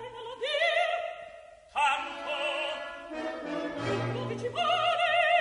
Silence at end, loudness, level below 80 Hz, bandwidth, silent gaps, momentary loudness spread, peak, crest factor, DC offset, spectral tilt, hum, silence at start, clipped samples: 0 s; -30 LUFS; -66 dBFS; 10.5 kHz; none; 12 LU; -14 dBFS; 16 dB; under 0.1%; -4 dB/octave; none; 0 s; under 0.1%